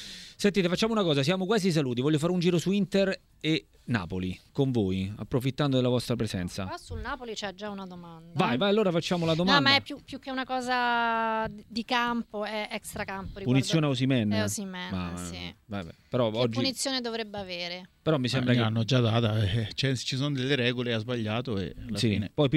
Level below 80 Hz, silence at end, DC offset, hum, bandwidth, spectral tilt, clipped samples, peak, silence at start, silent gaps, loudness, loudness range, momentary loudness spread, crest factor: -54 dBFS; 0 s; under 0.1%; none; 15 kHz; -5.5 dB/octave; under 0.1%; -6 dBFS; 0 s; none; -28 LUFS; 4 LU; 11 LU; 22 dB